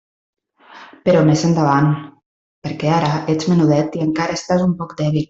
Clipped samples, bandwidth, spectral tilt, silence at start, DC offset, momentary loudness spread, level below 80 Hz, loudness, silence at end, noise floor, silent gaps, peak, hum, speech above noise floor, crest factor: under 0.1%; 7.8 kHz; -7 dB/octave; 0.75 s; under 0.1%; 8 LU; -52 dBFS; -17 LUFS; 0.05 s; -43 dBFS; 2.26-2.62 s; -2 dBFS; none; 27 dB; 14 dB